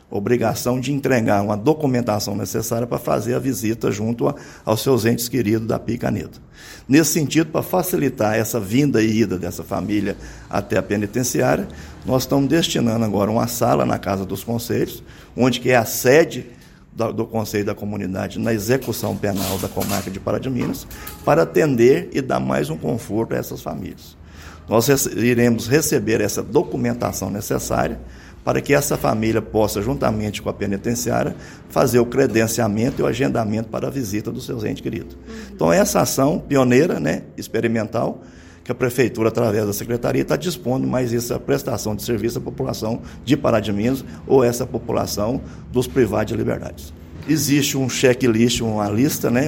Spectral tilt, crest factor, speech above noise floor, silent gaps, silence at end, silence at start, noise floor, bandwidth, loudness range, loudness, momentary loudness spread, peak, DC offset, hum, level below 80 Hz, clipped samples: -5 dB/octave; 18 dB; 20 dB; none; 0 s; 0.1 s; -39 dBFS; 16.5 kHz; 3 LU; -20 LUFS; 10 LU; 0 dBFS; under 0.1%; none; -44 dBFS; under 0.1%